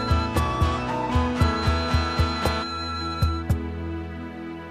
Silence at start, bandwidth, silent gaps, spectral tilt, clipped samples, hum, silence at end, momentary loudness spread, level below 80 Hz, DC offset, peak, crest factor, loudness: 0 s; 15 kHz; none; -6 dB/octave; under 0.1%; none; 0 s; 10 LU; -32 dBFS; under 0.1%; -8 dBFS; 16 dB; -25 LUFS